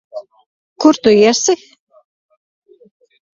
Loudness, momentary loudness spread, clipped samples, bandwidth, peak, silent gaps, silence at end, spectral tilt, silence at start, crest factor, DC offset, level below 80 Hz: -12 LUFS; 20 LU; under 0.1%; 7.6 kHz; 0 dBFS; 0.46-0.76 s; 1.8 s; -3.5 dB/octave; 0.15 s; 16 dB; under 0.1%; -58 dBFS